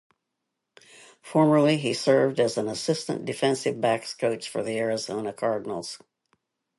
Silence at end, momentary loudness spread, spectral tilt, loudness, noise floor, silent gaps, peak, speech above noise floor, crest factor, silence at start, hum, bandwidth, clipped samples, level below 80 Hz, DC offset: 0.8 s; 10 LU; -5 dB/octave; -25 LUFS; -82 dBFS; none; -8 dBFS; 57 dB; 18 dB; 1.25 s; none; 11.5 kHz; under 0.1%; -70 dBFS; under 0.1%